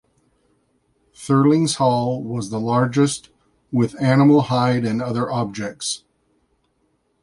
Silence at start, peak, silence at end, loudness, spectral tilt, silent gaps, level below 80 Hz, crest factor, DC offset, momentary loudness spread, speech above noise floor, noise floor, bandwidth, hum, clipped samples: 1.2 s; -4 dBFS; 1.25 s; -19 LUFS; -6 dB/octave; none; -58 dBFS; 16 dB; under 0.1%; 11 LU; 48 dB; -66 dBFS; 11.5 kHz; none; under 0.1%